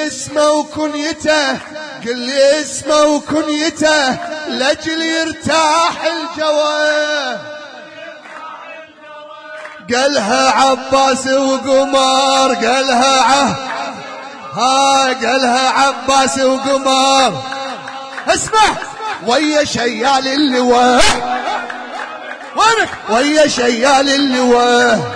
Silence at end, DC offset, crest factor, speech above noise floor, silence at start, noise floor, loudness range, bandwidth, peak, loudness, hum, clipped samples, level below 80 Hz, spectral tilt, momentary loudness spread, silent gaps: 0 s; under 0.1%; 14 dB; 22 dB; 0 s; -35 dBFS; 5 LU; 10.5 kHz; 0 dBFS; -13 LUFS; none; under 0.1%; -44 dBFS; -2.5 dB/octave; 16 LU; none